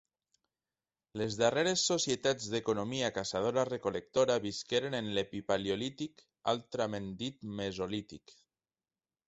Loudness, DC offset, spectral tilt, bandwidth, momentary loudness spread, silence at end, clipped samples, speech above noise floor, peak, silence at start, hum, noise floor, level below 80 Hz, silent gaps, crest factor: -34 LUFS; under 0.1%; -3.5 dB/octave; 8.2 kHz; 10 LU; 0.95 s; under 0.1%; over 56 dB; -14 dBFS; 1.15 s; none; under -90 dBFS; -66 dBFS; none; 20 dB